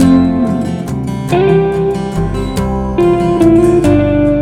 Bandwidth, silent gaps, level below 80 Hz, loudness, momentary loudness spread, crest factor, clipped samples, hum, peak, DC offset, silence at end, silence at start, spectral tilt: 13.5 kHz; none; -26 dBFS; -12 LUFS; 8 LU; 10 dB; 0.2%; none; 0 dBFS; under 0.1%; 0 s; 0 s; -8 dB/octave